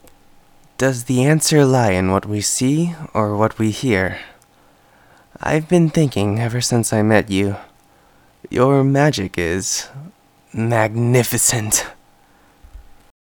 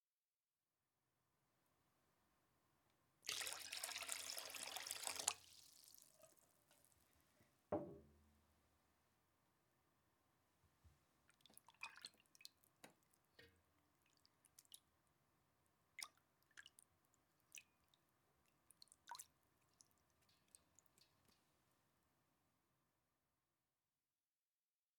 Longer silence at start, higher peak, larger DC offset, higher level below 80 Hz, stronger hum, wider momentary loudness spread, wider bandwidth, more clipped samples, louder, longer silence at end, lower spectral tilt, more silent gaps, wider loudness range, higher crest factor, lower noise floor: second, 0.8 s vs 3.25 s; first, 0 dBFS vs -22 dBFS; neither; first, -48 dBFS vs -90 dBFS; neither; second, 10 LU vs 22 LU; about the same, 20 kHz vs 19 kHz; neither; first, -17 LUFS vs -50 LUFS; second, 0.55 s vs 4.4 s; first, -5 dB/octave vs -1 dB/octave; neither; second, 3 LU vs 18 LU; second, 18 dB vs 38 dB; second, -52 dBFS vs under -90 dBFS